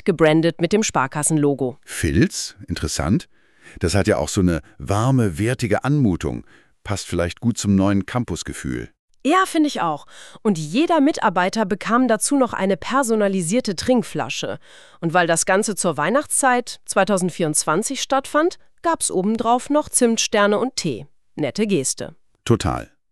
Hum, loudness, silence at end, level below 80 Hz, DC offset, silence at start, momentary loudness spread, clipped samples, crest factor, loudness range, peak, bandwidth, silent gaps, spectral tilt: none; -20 LUFS; 0.25 s; -42 dBFS; 0.5%; 0.05 s; 10 LU; under 0.1%; 18 dB; 3 LU; -2 dBFS; 13.5 kHz; 8.99-9.08 s; -4.5 dB/octave